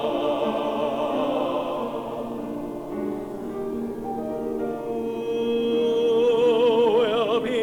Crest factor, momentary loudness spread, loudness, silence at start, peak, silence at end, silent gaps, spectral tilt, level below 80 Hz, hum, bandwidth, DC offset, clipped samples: 14 dB; 12 LU; -24 LUFS; 0 s; -10 dBFS; 0 s; none; -6 dB/octave; -54 dBFS; none; 15.5 kHz; under 0.1%; under 0.1%